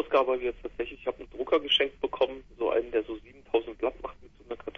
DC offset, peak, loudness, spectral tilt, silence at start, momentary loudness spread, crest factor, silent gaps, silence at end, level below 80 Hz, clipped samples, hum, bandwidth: under 0.1%; -10 dBFS; -29 LUFS; -4.5 dB/octave; 0 s; 16 LU; 20 dB; none; 0.05 s; -54 dBFS; under 0.1%; none; 6.6 kHz